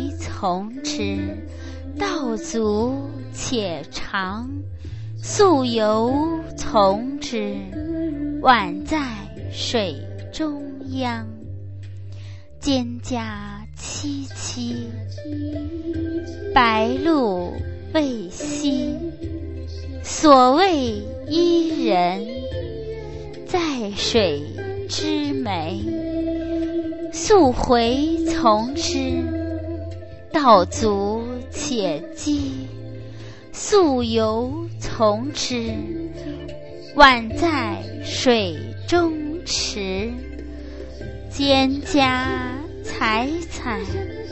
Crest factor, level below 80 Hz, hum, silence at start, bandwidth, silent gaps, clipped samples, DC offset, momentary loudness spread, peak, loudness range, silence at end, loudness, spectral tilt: 22 dB; -40 dBFS; none; 0 s; 8.4 kHz; none; under 0.1%; 0.8%; 17 LU; 0 dBFS; 9 LU; 0 s; -21 LUFS; -4.5 dB/octave